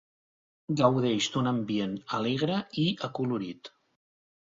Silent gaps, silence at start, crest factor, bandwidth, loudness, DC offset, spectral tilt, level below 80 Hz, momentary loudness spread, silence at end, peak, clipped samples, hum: none; 0.7 s; 20 dB; 7.8 kHz; -29 LUFS; under 0.1%; -5.5 dB/octave; -68 dBFS; 9 LU; 0.85 s; -10 dBFS; under 0.1%; none